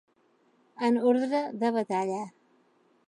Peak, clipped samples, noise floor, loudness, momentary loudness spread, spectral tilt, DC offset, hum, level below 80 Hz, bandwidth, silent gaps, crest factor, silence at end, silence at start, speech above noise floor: -12 dBFS; under 0.1%; -67 dBFS; -28 LUFS; 10 LU; -6 dB/octave; under 0.1%; none; -84 dBFS; 11 kHz; none; 18 dB; 0.8 s; 0.8 s; 40 dB